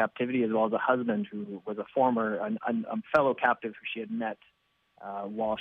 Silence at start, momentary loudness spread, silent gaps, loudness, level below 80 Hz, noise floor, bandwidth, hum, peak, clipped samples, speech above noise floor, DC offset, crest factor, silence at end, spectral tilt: 0 s; 11 LU; none; -30 LUFS; -70 dBFS; -60 dBFS; 6.4 kHz; none; -8 dBFS; under 0.1%; 31 dB; under 0.1%; 22 dB; 0 s; -8 dB/octave